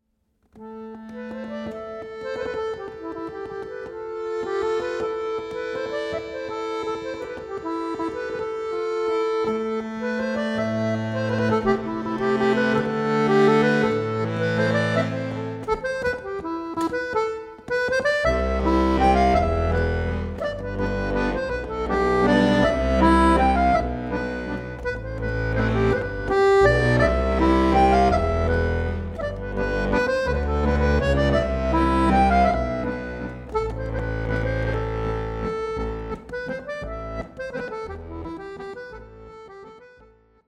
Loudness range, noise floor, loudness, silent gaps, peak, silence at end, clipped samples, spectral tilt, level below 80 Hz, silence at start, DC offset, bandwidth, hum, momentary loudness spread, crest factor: 11 LU; -68 dBFS; -23 LUFS; none; -6 dBFS; 0.6 s; under 0.1%; -7 dB/octave; -34 dBFS; 0.55 s; under 0.1%; 11 kHz; none; 15 LU; 18 dB